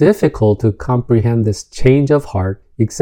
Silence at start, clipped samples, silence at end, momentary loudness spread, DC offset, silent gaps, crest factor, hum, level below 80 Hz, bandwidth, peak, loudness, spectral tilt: 0 s; under 0.1%; 0 s; 7 LU; under 0.1%; none; 14 dB; none; -34 dBFS; 17 kHz; 0 dBFS; -15 LUFS; -7.5 dB/octave